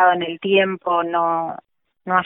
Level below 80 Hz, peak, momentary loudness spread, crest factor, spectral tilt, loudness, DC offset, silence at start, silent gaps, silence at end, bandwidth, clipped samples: -68 dBFS; -4 dBFS; 14 LU; 16 dB; -10 dB/octave; -20 LUFS; under 0.1%; 0 s; none; 0 s; 3.8 kHz; under 0.1%